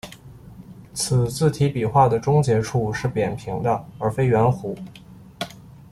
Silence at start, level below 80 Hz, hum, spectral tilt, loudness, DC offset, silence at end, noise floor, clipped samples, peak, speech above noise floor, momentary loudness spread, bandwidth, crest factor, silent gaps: 0.05 s; -48 dBFS; none; -6 dB/octave; -21 LUFS; under 0.1%; 0.2 s; -43 dBFS; under 0.1%; -4 dBFS; 22 dB; 16 LU; 13.5 kHz; 18 dB; none